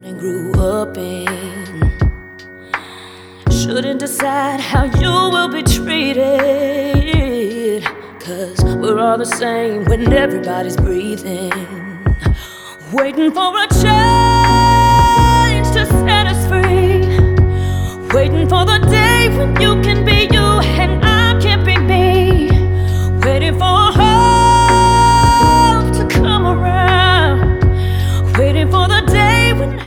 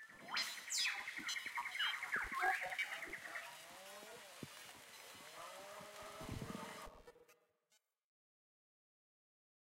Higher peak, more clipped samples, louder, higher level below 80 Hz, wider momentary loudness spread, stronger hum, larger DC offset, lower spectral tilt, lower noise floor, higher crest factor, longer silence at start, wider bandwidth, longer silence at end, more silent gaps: first, 0 dBFS vs -26 dBFS; neither; first, -13 LUFS vs -43 LUFS; first, -22 dBFS vs -70 dBFS; second, 12 LU vs 16 LU; neither; neither; first, -5.5 dB/octave vs -1 dB/octave; second, -35 dBFS vs -81 dBFS; second, 12 dB vs 22 dB; about the same, 0.05 s vs 0 s; about the same, 17.5 kHz vs 16 kHz; second, 0 s vs 2.45 s; neither